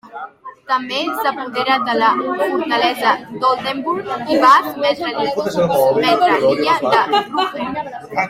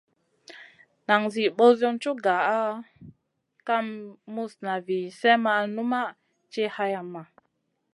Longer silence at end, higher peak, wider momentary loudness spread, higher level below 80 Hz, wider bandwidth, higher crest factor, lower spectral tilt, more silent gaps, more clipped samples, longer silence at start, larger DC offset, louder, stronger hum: second, 0 s vs 0.7 s; first, 0 dBFS vs -4 dBFS; second, 9 LU vs 19 LU; first, -58 dBFS vs -76 dBFS; first, 16 kHz vs 11.5 kHz; second, 16 dB vs 22 dB; about the same, -4.5 dB/octave vs -5 dB/octave; neither; neither; second, 0.05 s vs 0.5 s; neither; first, -16 LUFS vs -25 LUFS; neither